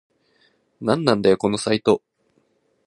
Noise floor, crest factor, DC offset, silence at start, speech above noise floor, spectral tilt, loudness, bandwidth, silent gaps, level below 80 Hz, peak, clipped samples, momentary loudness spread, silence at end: -65 dBFS; 22 dB; under 0.1%; 0.8 s; 46 dB; -5.5 dB/octave; -20 LUFS; 11.5 kHz; none; -58 dBFS; 0 dBFS; under 0.1%; 6 LU; 0.9 s